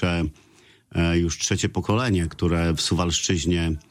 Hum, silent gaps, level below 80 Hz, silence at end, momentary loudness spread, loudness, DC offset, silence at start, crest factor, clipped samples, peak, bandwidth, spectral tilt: none; none; -36 dBFS; 0.1 s; 3 LU; -23 LUFS; under 0.1%; 0 s; 14 dB; under 0.1%; -8 dBFS; 15 kHz; -4.5 dB/octave